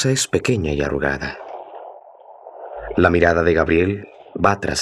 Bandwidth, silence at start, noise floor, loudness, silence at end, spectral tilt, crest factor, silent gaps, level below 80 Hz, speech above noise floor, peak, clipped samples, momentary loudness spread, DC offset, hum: 13 kHz; 0 s; -43 dBFS; -19 LUFS; 0 s; -5 dB/octave; 18 dB; none; -40 dBFS; 25 dB; 0 dBFS; under 0.1%; 20 LU; under 0.1%; none